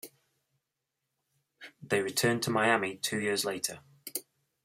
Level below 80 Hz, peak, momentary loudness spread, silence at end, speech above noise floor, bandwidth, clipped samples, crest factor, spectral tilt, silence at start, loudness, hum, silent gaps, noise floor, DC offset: -74 dBFS; -10 dBFS; 15 LU; 0.45 s; 56 dB; 16 kHz; under 0.1%; 24 dB; -3.5 dB/octave; 0.05 s; -30 LUFS; none; none; -86 dBFS; under 0.1%